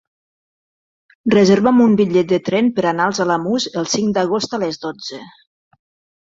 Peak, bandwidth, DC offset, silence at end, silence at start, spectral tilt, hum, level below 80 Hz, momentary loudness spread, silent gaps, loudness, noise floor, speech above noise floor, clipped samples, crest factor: -2 dBFS; 7.8 kHz; under 0.1%; 0.95 s; 1.25 s; -5 dB/octave; none; -56 dBFS; 14 LU; none; -16 LUFS; under -90 dBFS; over 74 dB; under 0.1%; 16 dB